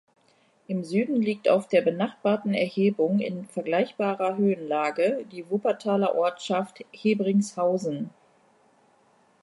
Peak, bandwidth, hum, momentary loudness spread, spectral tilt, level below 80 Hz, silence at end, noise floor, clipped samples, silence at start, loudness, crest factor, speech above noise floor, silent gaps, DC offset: -8 dBFS; 11.5 kHz; none; 9 LU; -6.5 dB/octave; -76 dBFS; 1.35 s; -64 dBFS; under 0.1%; 0.7 s; -26 LUFS; 18 dB; 38 dB; none; under 0.1%